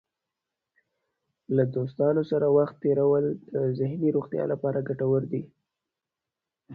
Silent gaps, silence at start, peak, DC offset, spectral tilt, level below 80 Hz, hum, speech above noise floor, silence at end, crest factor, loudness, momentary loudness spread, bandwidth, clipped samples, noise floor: none; 1.5 s; -10 dBFS; under 0.1%; -11.5 dB/octave; -66 dBFS; none; 63 dB; 0 s; 18 dB; -26 LUFS; 6 LU; 4.7 kHz; under 0.1%; -88 dBFS